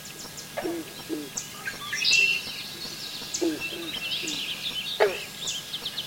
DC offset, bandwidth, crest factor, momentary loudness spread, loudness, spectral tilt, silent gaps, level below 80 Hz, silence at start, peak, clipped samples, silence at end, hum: under 0.1%; 17 kHz; 24 dB; 14 LU; -27 LUFS; -1.5 dB/octave; none; -62 dBFS; 0 s; -6 dBFS; under 0.1%; 0 s; none